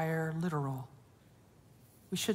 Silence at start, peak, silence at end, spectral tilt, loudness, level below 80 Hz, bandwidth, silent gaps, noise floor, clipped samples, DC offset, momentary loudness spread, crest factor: 0 s; -20 dBFS; 0 s; -5 dB/octave; -37 LUFS; -72 dBFS; 16 kHz; none; -62 dBFS; under 0.1%; under 0.1%; 10 LU; 16 dB